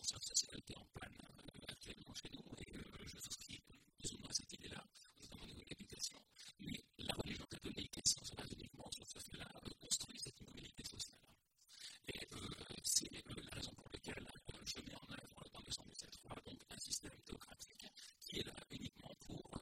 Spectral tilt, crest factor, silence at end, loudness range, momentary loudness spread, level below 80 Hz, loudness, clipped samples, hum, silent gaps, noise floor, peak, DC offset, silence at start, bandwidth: -2 dB/octave; 30 dB; 0 s; 7 LU; 17 LU; -66 dBFS; -48 LUFS; under 0.1%; none; none; -73 dBFS; -22 dBFS; under 0.1%; 0 s; 16 kHz